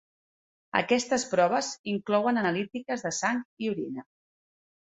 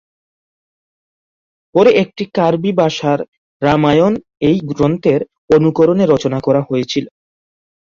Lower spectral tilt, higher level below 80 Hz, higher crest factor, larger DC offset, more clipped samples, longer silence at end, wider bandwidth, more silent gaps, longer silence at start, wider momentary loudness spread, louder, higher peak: second, -4 dB/octave vs -7 dB/octave; second, -72 dBFS vs -48 dBFS; about the same, 20 dB vs 16 dB; neither; neither; about the same, 0.85 s vs 0.9 s; first, 8.4 kHz vs 7.4 kHz; second, 1.79-1.84 s, 3.45-3.57 s vs 3.28-3.60 s, 5.38-5.48 s; second, 0.75 s vs 1.75 s; about the same, 8 LU vs 8 LU; second, -28 LUFS vs -14 LUFS; second, -8 dBFS vs 0 dBFS